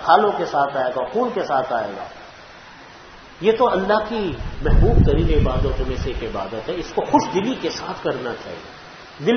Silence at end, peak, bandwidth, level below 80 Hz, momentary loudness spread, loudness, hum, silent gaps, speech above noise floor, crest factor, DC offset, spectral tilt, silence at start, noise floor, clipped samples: 0 s; 0 dBFS; 6.6 kHz; -26 dBFS; 23 LU; -21 LUFS; none; none; 23 dB; 20 dB; under 0.1%; -6.5 dB/octave; 0 s; -42 dBFS; under 0.1%